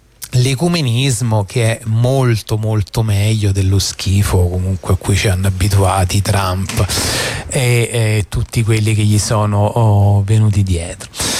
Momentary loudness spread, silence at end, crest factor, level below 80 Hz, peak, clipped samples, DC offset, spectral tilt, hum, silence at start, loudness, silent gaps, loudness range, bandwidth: 5 LU; 0 s; 10 dB; -32 dBFS; -4 dBFS; under 0.1%; under 0.1%; -5 dB/octave; none; 0.2 s; -15 LUFS; none; 1 LU; 15 kHz